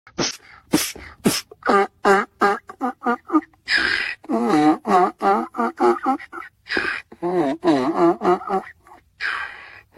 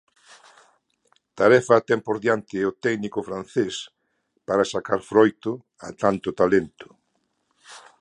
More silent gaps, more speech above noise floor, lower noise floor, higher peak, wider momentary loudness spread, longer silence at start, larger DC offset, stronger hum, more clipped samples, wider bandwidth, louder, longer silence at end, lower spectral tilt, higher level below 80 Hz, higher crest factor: neither; second, 28 dB vs 50 dB; second, -49 dBFS vs -72 dBFS; about the same, -2 dBFS vs -2 dBFS; second, 9 LU vs 16 LU; second, 0.2 s vs 1.35 s; neither; neither; neither; first, 16.5 kHz vs 11 kHz; about the same, -21 LUFS vs -22 LUFS; about the same, 0.2 s vs 0.2 s; second, -4 dB/octave vs -5.5 dB/octave; about the same, -56 dBFS vs -60 dBFS; about the same, 18 dB vs 22 dB